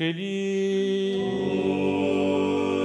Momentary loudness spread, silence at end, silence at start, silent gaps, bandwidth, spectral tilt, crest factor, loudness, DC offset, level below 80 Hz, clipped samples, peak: 3 LU; 0 s; 0 s; none; 10.5 kHz; -6.5 dB/octave; 12 dB; -25 LUFS; under 0.1%; -66 dBFS; under 0.1%; -12 dBFS